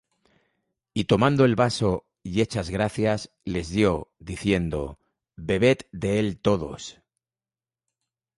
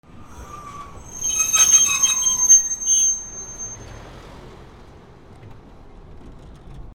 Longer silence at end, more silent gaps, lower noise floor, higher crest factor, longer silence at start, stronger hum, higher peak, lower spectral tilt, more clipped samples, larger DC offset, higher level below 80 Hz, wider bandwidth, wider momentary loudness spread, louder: first, 1.45 s vs 0.05 s; neither; first, under -90 dBFS vs -44 dBFS; about the same, 20 dB vs 20 dB; first, 0.95 s vs 0.15 s; neither; second, -6 dBFS vs -2 dBFS; first, -6 dB/octave vs 1 dB/octave; neither; neither; about the same, -46 dBFS vs -46 dBFS; second, 11.5 kHz vs over 20 kHz; second, 13 LU vs 25 LU; second, -24 LUFS vs -14 LUFS